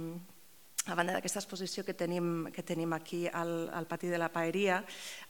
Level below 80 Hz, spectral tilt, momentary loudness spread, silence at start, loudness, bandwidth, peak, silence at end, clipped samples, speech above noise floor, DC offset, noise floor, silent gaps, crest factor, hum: -82 dBFS; -4 dB/octave; 7 LU; 0 s; -36 LUFS; 19 kHz; -14 dBFS; 0 s; under 0.1%; 25 dB; 0.1%; -61 dBFS; none; 22 dB; none